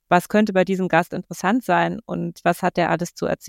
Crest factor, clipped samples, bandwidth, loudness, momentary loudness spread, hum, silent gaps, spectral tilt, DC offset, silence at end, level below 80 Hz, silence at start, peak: 18 dB; under 0.1%; 17 kHz; -21 LUFS; 7 LU; none; none; -6 dB/octave; under 0.1%; 0 s; -56 dBFS; 0.1 s; -2 dBFS